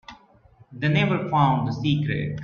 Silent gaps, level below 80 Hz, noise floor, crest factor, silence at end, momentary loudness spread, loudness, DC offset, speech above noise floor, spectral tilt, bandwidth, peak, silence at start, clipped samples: none; -54 dBFS; -54 dBFS; 18 dB; 0 s; 5 LU; -23 LUFS; under 0.1%; 32 dB; -8 dB/octave; 6.8 kHz; -4 dBFS; 0.1 s; under 0.1%